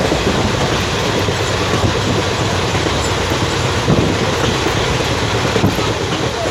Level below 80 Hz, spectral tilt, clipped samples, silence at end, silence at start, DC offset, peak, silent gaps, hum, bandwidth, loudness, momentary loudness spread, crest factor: -30 dBFS; -4.5 dB/octave; under 0.1%; 0 s; 0 s; under 0.1%; 0 dBFS; none; none; 16.5 kHz; -16 LUFS; 2 LU; 14 dB